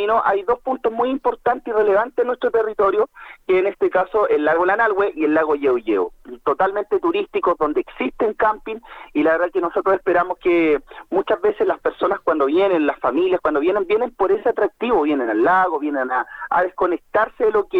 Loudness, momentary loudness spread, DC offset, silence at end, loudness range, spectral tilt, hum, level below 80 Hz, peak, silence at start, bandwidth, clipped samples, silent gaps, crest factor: -19 LUFS; 5 LU; under 0.1%; 0 s; 2 LU; -7 dB/octave; none; -52 dBFS; -4 dBFS; 0 s; 5.2 kHz; under 0.1%; none; 14 dB